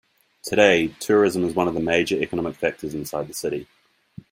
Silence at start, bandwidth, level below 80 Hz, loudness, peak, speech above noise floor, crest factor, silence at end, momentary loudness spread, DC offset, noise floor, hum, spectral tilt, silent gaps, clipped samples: 0.45 s; 16.5 kHz; -56 dBFS; -22 LUFS; -2 dBFS; 24 dB; 22 dB; 0.7 s; 12 LU; under 0.1%; -46 dBFS; none; -4.5 dB/octave; none; under 0.1%